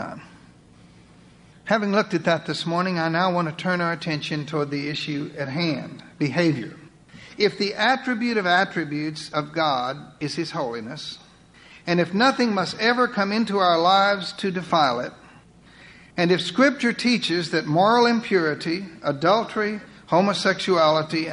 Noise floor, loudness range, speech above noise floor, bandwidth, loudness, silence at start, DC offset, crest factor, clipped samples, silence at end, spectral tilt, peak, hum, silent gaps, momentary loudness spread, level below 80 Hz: -50 dBFS; 5 LU; 28 dB; 11 kHz; -22 LUFS; 0 s; under 0.1%; 18 dB; under 0.1%; 0 s; -5 dB/octave; -6 dBFS; none; none; 12 LU; -62 dBFS